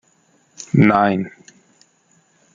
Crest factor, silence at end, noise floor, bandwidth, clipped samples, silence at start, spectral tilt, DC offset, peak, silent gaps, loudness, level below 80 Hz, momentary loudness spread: 18 dB; 1.25 s; -59 dBFS; 7.6 kHz; under 0.1%; 0.6 s; -7.5 dB/octave; under 0.1%; -2 dBFS; none; -16 LUFS; -54 dBFS; 19 LU